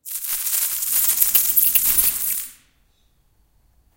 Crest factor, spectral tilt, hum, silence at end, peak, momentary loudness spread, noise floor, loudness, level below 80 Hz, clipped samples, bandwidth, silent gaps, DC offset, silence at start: 22 dB; 2 dB/octave; none; 1.45 s; 0 dBFS; 10 LU; -61 dBFS; -16 LUFS; -52 dBFS; under 0.1%; 18 kHz; none; under 0.1%; 0.05 s